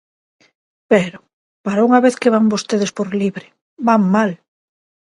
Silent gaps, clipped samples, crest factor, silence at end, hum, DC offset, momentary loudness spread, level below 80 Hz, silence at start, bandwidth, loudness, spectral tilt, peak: 1.33-1.64 s, 3.61-3.77 s; under 0.1%; 18 dB; 0.8 s; none; under 0.1%; 12 LU; -64 dBFS; 0.9 s; 11.5 kHz; -16 LUFS; -6 dB/octave; 0 dBFS